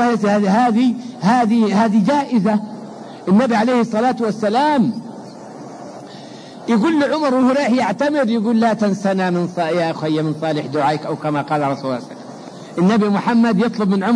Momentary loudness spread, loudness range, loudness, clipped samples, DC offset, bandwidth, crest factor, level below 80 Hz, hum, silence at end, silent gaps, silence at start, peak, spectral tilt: 19 LU; 4 LU; -17 LUFS; under 0.1%; under 0.1%; 10.5 kHz; 14 dB; -62 dBFS; none; 0 s; none; 0 s; -4 dBFS; -7 dB/octave